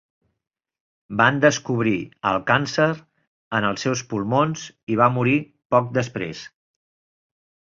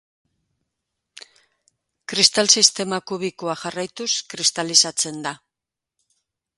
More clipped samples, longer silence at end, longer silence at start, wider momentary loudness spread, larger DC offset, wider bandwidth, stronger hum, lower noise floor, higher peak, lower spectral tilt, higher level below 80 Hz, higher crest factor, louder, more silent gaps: neither; about the same, 1.25 s vs 1.2 s; second, 1.1 s vs 2.1 s; second, 12 LU vs 15 LU; neither; second, 7.6 kHz vs 16 kHz; neither; about the same, under -90 dBFS vs -87 dBFS; about the same, -2 dBFS vs 0 dBFS; first, -5.5 dB/octave vs -1 dB/octave; first, -58 dBFS vs -70 dBFS; about the same, 20 dB vs 24 dB; second, -21 LUFS vs -18 LUFS; first, 3.27-3.51 s, 4.83-4.87 s, 5.65-5.70 s vs none